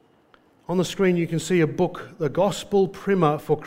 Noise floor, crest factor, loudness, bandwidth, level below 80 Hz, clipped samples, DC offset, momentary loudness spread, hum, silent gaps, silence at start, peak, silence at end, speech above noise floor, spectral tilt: -58 dBFS; 18 dB; -23 LUFS; 16 kHz; -54 dBFS; under 0.1%; under 0.1%; 6 LU; none; none; 0.7 s; -4 dBFS; 0 s; 36 dB; -6 dB/octave